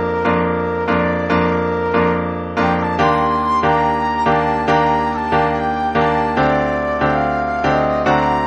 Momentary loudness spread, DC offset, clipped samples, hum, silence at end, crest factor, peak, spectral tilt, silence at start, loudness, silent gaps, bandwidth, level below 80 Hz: 3 LU; 0.2%; under 0.1%; none; 0 s; 12 dB; -4 dBFS; -7 dB/octave; 0 s; -17 LUFS; none; 9 kHz; -36 dBFS